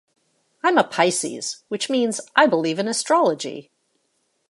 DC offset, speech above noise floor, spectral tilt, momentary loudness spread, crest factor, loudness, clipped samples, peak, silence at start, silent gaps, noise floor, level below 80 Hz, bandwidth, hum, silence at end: under 0.1%; 49 dB; -3 dB/octave; 11 LU; 20 dB; -21 LUFS; under 0.1%; -2 dBFS; 0.65 s; none; -70 dBFS; -78 dBFS; 11.5 kHz; none; 0.85 s